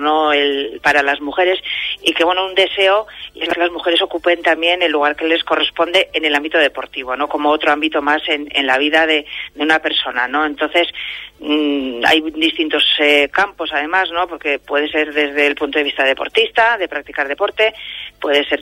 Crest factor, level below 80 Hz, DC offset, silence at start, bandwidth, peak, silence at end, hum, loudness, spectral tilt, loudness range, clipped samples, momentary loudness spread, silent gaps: 16 dB; -52 dBFS; under 0.1%; 0 s; 16 kHz; 0 dBFS; 0 s; 50 Hz at -55 dBFS; -15 LUFS; -2.5 dB/octave; 1 LU; under 0.1%; 7 LU; none